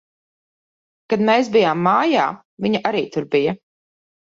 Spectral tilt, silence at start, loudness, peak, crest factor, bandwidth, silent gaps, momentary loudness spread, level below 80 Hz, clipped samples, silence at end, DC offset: -6 dB/octave; 1.1 s; -18 LUFS; -4 dBFS; 16 dB; 7.6 kHz; 2.45-2.57 s; 9 LU; -64 dBFS; under 0.1%; 0.8 s; under 0.1%